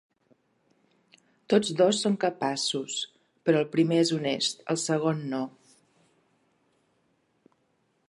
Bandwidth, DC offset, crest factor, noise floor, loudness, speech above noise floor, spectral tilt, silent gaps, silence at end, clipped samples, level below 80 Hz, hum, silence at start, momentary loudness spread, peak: 11.5 kHz; under 0.1%; 20 dB; -72 dBFS; -27 LUFS; 46 dB; -4.5 dB/octave; none; 2.6 s; under 0.1%; -78 dBFS; none; 1.5 s; 10 LU; -8 dBFS